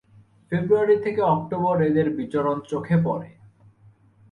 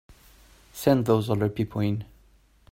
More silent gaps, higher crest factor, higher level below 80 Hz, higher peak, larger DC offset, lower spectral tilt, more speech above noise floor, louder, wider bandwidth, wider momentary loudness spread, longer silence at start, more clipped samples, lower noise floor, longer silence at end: neither; about the same, 16 dB vs 20 dB; about the same, -58 dBFS vs -54 dBFS; about the same, -8 dBFS vs -6 dBFS; neither; first, -9.5 dB/octave vs -7.5 dB/octave; about the same, 33 dB vs 35 dB; about the same, -23 LUFS vs -25 LUFS; second, 9.2 kHz vs 16.5 kHz; second, 8 LU vs 16 LU; first, 0.5 s vs 0.1 s; neither; second, -55 dBFS vs -59 dBFS; first, 1.05 s vs 0.7 s